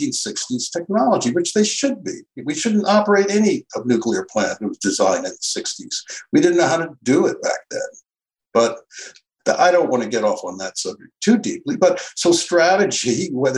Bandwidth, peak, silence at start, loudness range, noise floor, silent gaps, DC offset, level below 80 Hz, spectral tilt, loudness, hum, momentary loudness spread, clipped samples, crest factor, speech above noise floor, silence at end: 12 kHz; -2 dBFS; 0 s; 2 LU; -84 dBFS; none; under 0.1%; -66 dBFS; -3.5 dB/octave; -19 LUFS; none; 12 LU; under 0.1%; 16 dB; 65 dB; 0 s